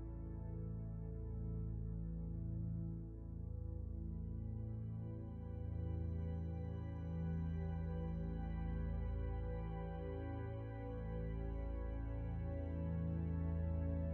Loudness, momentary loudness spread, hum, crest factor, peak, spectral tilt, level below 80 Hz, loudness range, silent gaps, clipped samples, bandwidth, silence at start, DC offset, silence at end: -45 LUFS; 6 LU; none; 12 dB; -32 dBFS; -10 dB/octave; -48 dBFS; 3 LU; none; under 0.1%; 4.1 kHz; 0 s; under 0.1%; 0 s